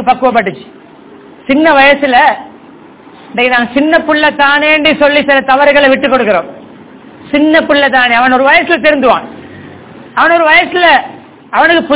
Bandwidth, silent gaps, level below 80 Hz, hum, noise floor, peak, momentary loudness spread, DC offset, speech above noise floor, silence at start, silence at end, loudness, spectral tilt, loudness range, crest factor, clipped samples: 4 kHz; none; -44 dBFS; none; -35 dBFS; 0 dBFS; 10 LU; under 0.1%; 27 dB; 0 s; 0 s; -7 LUFS; -7 dB/octave; 2 LU; 10 dB; 3%